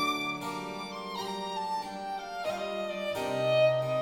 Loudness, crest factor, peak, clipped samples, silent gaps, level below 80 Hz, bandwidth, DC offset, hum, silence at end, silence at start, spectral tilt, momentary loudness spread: -32 LUFS; 16 dB; -14 dBFS; under 0.1%; none; -68 dBFS; 17.5 kHz; under 0.1%; none; 0 s; 0 s; -4.5 dB/octave; 12 LU